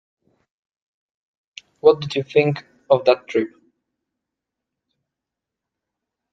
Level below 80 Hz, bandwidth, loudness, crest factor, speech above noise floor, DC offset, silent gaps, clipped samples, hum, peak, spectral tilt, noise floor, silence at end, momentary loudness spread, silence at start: -66 dBFS; 7.8 kHz; -19 LUFS; 22 dB; 67 dB; under 0.1%; none; under 0.1%; none; 0 dBFS; -6.5 dB/octave; -85 dBFS; 2.85 s; 8 LU; 1.85 s